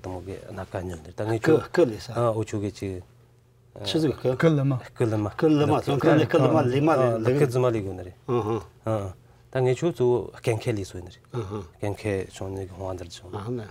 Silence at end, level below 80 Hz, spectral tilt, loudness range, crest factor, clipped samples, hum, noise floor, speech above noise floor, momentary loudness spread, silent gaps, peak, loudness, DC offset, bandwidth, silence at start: 0 s; -56 dBFS; -7 dB/octave; 6 LU; 20 dB; under 0.1%; none; -57 dBFS; 32 dB; 15 LU; none; -6 dBFS; -25 LUFS; under 0.1%; 16 kHz; 0.05 s